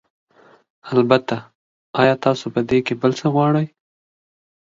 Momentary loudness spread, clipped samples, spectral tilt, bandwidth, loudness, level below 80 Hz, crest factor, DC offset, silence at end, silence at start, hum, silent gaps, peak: 11 LU; under 0.1%; -7 dB/octave; 7.6 kHz; -19 LUFS; -56 dBFS; 20 dB; under 0.1%; 1.05 s; 0.85 s; none; 1.55-1.93 s; 0 dBFS